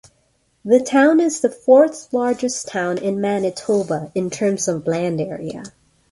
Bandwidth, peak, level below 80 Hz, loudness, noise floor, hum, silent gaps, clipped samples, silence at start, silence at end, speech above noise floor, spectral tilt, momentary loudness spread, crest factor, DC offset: 11.5 kHz; -2 dBFS; -60 dBFS; -18 LUFS; -63 dBFS; none; none; under 0.1%; 0.65 s; 0.45 s; 45 dB; -5 dB/octave; 11 LU; 16 dB; under 0.1%